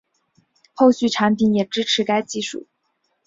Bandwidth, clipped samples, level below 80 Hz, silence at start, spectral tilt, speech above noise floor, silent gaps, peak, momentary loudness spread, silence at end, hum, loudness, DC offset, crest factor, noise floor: 7.8 kHz; under 0.1%; -62 dBFS; 0.8 s; -4.5 dB/octave; 52 dB; none; -2 dBFS; 11 LU; 0.65 s; none; -19 LUFS; under 0.1%; 18 dB; -70 dBFS